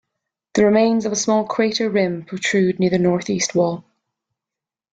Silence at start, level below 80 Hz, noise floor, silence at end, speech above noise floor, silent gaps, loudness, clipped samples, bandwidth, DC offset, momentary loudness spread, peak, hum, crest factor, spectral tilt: 0.55 s; -58 dBFS; -88 dBFS; 1.15 s; 70 dB; none; -19 LUFS; under 0.1%; 9.2 kHz; under 0.1%; 7 LU; -4 dBFS; none; 16 dB; -4.5 dB/octave